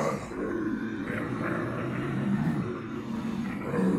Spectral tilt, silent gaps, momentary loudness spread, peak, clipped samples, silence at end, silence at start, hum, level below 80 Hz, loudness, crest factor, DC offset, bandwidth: -7.5 dB/octave; none; 5 LU; -16 dBFS; under 0.1%; 0 s; 0 s; none; -54 dBFS; -31 LUFS; 14 dB; under 0.1%; 13 kHz